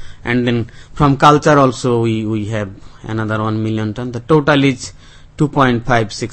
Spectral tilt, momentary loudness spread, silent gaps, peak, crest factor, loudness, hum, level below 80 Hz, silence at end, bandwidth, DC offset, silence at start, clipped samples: -6.5 dB/octave; 15 LU; none; 0 dBFS; 14 dB; -15 LUFS; none; -38 dBFS; 0 s; 8.8 kHz; under 0.1%; 0 s; 0.2%